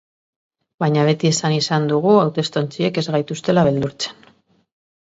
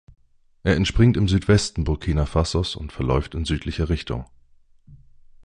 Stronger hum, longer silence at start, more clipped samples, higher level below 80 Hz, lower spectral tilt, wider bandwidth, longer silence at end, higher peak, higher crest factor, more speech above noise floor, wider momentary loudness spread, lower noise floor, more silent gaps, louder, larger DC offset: neither; first, 0.8 s vs 0.65 s; neither; second, -54 dBFS vs -30 dBFS; about the same, -5.5 dB/octave vs -6 dB/octave; second, 8 kHz vs 10.5 kHz; first, 0.9 s vs 0.5 s; about the same, -2 dBFS vs -4 dBFS; about the same, 18 dB vs 18 dB; first, 38 dB vs 32 dB; about the same, 8 LU vs 10 LU; about the same, -55 dBFS vs -53 dBFS; neither; first, -18 LUFS vs -22 LUFS; neither